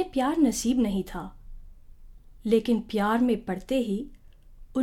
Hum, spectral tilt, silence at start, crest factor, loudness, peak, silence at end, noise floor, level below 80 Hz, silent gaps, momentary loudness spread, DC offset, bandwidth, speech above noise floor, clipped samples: none; -5.5 dB/octave; 0 s; 16 dB; -26 LUFS; -10 dBFS; 0 s; -48 dBFS; -46 dBFS; none; 13 LU; under 0.1%; 16.5 kHz; 23 dB; under 0.1%